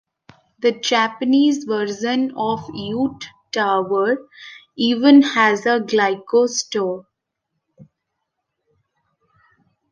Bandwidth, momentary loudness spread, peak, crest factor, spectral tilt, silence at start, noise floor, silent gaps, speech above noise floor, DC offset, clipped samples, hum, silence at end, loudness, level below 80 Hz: 7.4 kHz; 13 LU; 0 dBFS; 18 dB; -4 dB/octave; 0.6 s; -77 dBFS; none; 60 dB; under 0.1%; under 0.1%; none; 2.05 s; -18 LUFS; -64 dBFS